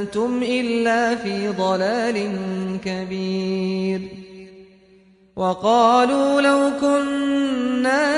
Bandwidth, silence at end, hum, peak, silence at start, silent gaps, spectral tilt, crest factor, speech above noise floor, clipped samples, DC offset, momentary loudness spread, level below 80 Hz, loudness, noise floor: 11 kHz; 0 s; none; -4 dBFS; 0 s; none; -5.5 dB/octave; 16 dB; 33 dB; under 0.1%; under 0.1%; 10 LU; -58 dBFS; -20 LUFS; -53 dBFS